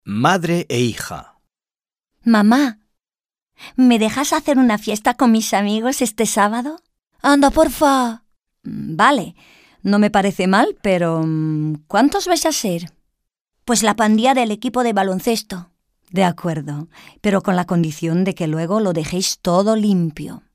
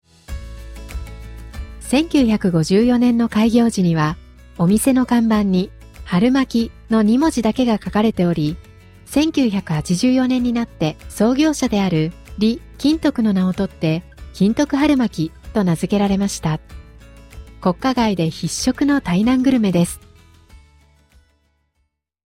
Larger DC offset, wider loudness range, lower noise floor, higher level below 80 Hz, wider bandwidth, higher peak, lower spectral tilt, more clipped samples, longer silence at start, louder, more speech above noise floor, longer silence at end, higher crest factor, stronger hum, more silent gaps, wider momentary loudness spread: neither; about the same, 4 LU vs 4 LU; first, under -90 dBFS vs -69 dBFS; second, -46 dBFS vs -38 dBFS; about the same, 16 kHz vs 15.5 kHz; first, 0 dBFS vs -4 dBFS; about the same, -5 dB/octave vs -6 dB/octave; neither; second, 0.05 s vs 0.3 s; about the same, -17 LUFS vs -18 LUFS; first, over 73 dB vs 53 dB; second, 0.15 s vs 1.75 s; about the same, 16 dB vs 14 dB; neither; first, 13.41-13.45 s vs none; second, 13 LU vs 17 LU